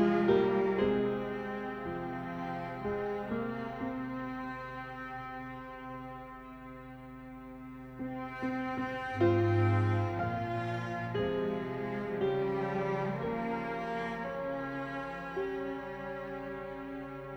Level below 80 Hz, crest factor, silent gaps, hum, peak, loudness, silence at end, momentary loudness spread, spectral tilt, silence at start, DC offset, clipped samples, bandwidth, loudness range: -58 dBFS; 20 dB; none; none; -14 dBFS; -35 LUFS; 0 s; 16 LU; -8.5 dB/octave; 0 s; under 0.1%; under 0.1%; over 20 kHz; 11 LU